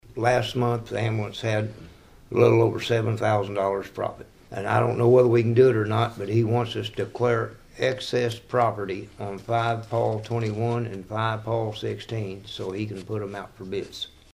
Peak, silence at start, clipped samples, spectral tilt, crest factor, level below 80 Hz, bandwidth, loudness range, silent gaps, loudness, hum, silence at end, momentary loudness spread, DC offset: -6 dBFS; 0.05 s; under 0.1%; -7 dB/octave; 18 dB; -54 dBFS; 12.5 kHz; 7 LU; none; -25 LUFS; none; 0.25 s; 14 LU; under 0.1%